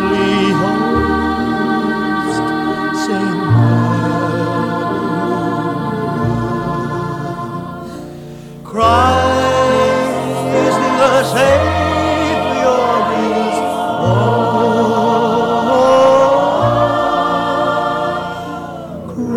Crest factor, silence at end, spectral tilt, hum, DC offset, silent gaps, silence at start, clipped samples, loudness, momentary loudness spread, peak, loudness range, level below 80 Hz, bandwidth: 14 dB; 0 s; -6 dB/octave; none; under 0.1%; none; 0 s; under 0.1%; -14 LUFS; 12 LU; 0 dBFS; 6 LU; -38 dBFS; 16 kHz